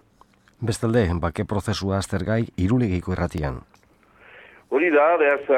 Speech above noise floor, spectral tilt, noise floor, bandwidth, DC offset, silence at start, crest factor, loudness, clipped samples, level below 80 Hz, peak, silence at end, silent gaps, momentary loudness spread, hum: 35 dB; -6.5 dB/octave; -56 dBFS; 14 kHz; under 0.1%; 0.6 s; 18 dB; -23 LUFS; under 0.1%; -42 dBFS; -6 dBFS; 0 s; none; 11 LU; none